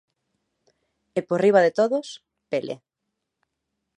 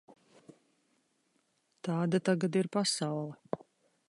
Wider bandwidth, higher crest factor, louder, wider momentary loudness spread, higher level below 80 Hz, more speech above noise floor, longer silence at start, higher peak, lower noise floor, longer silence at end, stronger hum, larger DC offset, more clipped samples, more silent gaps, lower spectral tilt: about the same, 10.5 kHz vs 11.5 kHz; about the same, 22 dB vs 20 dB; first, -22 LUFS vs -33 LUFS; first, 21 LU vs 13 LU; about the same, -78 dBFS vs -80 dBFS; first, 60 dB vs 44 dB; second, 1.15 s vs 1.85 s; first, -4 dBFS vs -14 dBFS; first, -81 dBFS vs -76 dBFS; first, 1.2 s vs 0.5 s; neither; neither; neither; neither; about the same, -6 dB/octave vs -5 dB/octave